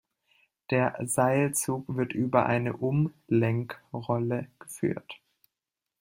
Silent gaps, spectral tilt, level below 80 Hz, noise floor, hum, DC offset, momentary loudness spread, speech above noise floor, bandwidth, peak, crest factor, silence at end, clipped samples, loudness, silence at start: none; -6 dB/octave; -66 dBFS; -88 dBFS; none; under 0.1%; 13 LU; 60 dB; 16.5 kHz; -8 dBFS; 22 dB; 0.85 s; under 0.1%; -28 LUFS; 0.7 s